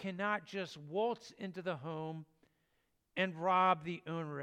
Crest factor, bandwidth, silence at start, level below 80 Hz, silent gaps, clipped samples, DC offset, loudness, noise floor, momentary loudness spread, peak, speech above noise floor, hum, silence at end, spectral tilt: 20 dB; 11 kHz; 0 s; -82 dBFS; none; under 0.1%; under 0.1%; -37 LUFS; -80 dBFS; 14 LU; -18 dBFS; 42 dB; none; 0 s; -6 dB/octave